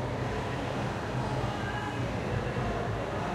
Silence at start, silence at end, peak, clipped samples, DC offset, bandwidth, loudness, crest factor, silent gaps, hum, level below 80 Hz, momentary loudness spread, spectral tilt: 0 s; 0 s; -18 dBFS; under 0.1%; under 0.1%; 13.5 kHz; -33 LUFS; 14 dB; none; none; -44 dBFS; 1 LU; -6.5 dB/octave